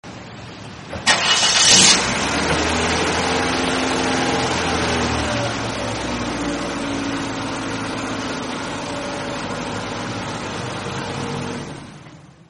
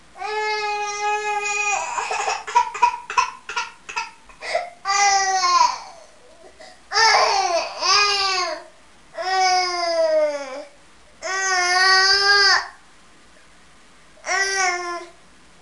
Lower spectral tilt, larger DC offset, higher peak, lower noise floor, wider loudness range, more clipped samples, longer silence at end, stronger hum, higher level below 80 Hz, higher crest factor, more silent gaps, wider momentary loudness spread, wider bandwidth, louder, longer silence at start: first, -2.5 dB/octave vs 1 dB/octave; second, under 0.1% vs 0.3%; first, 0 dBFS vs -4 dBFS; second, -42 dBFS vs -51 dBFS; first, 11 LU vs 5 LU; neither; second, 0.2 s vs 0.55 s; neither; first, -40 dBFS vs -58 dBFS; about the same, 22 dB vs 18 dB; neither; about the same, 14 LU vs 16 LU; about the same, 11.5 kHz vs 11.5 kHz; about the same, -19 LUFS vs -19 LUFS; about the same, 0.05 s vs 0.15 s